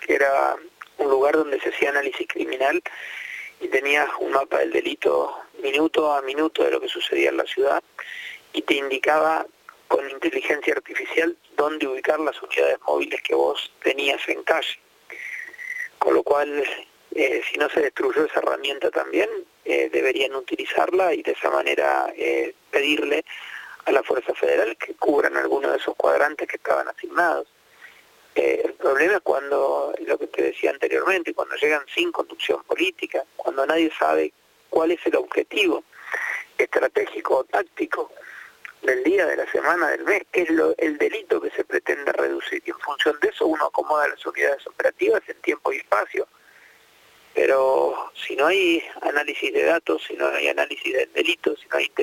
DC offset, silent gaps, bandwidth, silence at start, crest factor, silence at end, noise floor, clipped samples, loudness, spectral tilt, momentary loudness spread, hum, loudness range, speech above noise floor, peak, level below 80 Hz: under 0.1%; none; 17 kHz; 0 s; 20 dB; 0 s; -54 dBFS; under 0.1%; -23 LUFS; -2.5 dB/octave; 9 LU; none; 2 LU; 32 dB; -2 dBFS; -68 dBFS